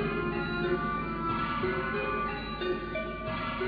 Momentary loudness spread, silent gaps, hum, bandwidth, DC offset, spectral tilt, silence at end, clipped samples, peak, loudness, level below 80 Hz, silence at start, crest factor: 4 LU; none; none; 5 kHz; under 0.1%; -9 dB/octave; 0 s; under 0.1%; -18 dBFS; -32 LUFS; -46 dBFS; 0 s; 14 dB